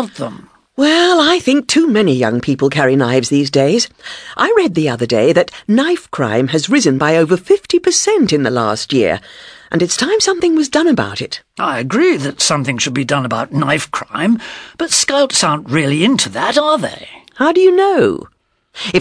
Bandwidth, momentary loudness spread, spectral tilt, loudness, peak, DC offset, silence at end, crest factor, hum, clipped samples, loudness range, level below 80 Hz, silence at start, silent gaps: 11 kHz; 9 LU; -4 dB/octave; -13 LUFS; 0 dBFS; under 0.1%; 0 s; 14 dB; none; under 0.1%; 2 LU; -52 dBFS; 0 s; none